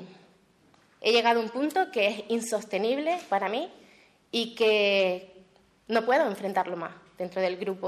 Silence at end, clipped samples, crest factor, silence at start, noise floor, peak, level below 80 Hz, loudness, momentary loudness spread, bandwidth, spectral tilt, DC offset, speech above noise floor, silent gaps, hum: 0 s; under 0.1%; 18 dB; 0 s; -62 dBFS; -10 dBFS; -76 dBFS; -27 LUFS; 11 LU; 13.5 kHz; -3.5 dB/octave; under 0.1%; 35 dB; none; none